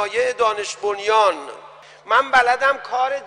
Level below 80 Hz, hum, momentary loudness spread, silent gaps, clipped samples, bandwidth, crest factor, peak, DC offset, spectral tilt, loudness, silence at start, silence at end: -60 dBFS; none; 9 LU; none; under 0.1%; 10.5 kHz; 16 dB; -4 dBFS; under 0.1%; -1 dB/octave; -18 LUFS; 0 s; 0 s